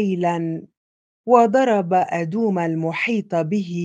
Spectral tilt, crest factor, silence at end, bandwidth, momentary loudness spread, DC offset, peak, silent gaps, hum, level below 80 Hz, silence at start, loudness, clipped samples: -7 dB/octave; 20 dB; 0 s; 9.2 kHz; 10 LU; under 0.1%; 0 dBFS; 0.77-1.24 s; none; -72 dBFS; 0 s; -20 LUFS; under 0.1%